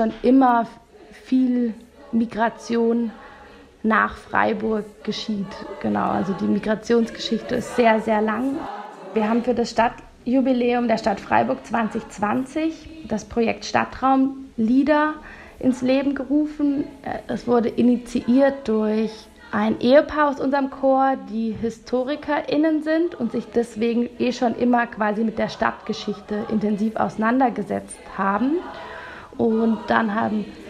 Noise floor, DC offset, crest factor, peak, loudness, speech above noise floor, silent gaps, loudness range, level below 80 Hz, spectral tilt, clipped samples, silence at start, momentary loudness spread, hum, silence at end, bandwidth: -46 dBFS; under 0.1%; 20 dB; -2 dBFS; -22 LUFS; 25 dB; none; 3 LU; -52 dBFS; -6 dB/octave; under 0.1%; 0 s; 10 LU; none; 0 s; 11 kHz